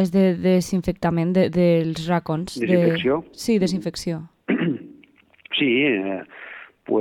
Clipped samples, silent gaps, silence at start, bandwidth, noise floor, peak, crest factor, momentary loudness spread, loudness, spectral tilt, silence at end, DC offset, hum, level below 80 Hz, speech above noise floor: under 0.1%; none; 0 s; 13.5 kHz; -53 dBFS; -6 dBFS; 16 dB; 13 LU; -21 LUFS; -6.5 dB/octave; 0 s; under 0.1%; none; -50 dBFS; 33 dB